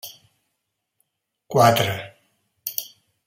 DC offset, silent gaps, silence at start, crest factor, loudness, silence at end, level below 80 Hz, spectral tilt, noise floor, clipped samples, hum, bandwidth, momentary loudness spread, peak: under 0.1%; none; 0.05 s; 22 dB; -21 LUFS; 0.4 s; -64 dBFS; -4.5 dB/octave; -78 dBFS; under 0.1%; none; 16.5 kHz; 24 LU; -2 dBFS